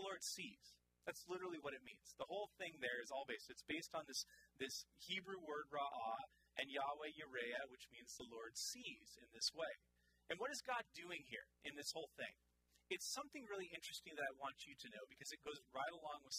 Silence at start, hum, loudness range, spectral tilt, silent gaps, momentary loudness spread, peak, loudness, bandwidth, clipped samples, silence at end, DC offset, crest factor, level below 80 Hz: 0 s; none; 2 LU; -1.5 dB/octave; none; 9 LU; -30 dBFS; -50 LUFS; 15.5 kHz; under 0.1%; 0 s; under 0.1%; 22 dB; -84 dBFS